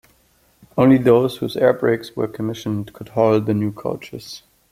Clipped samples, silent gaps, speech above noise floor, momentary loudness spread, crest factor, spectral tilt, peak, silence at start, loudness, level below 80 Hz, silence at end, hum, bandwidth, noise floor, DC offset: under 0.1%; none; 40 dB; 17 LU; 18 dB; -7.5 dB/octave; -2 dBFS; 0.75 s; -19 LUFS; -56 dBFS; 0.35 s; none; 15.5 kHz; -58 dBFS; under 0.1%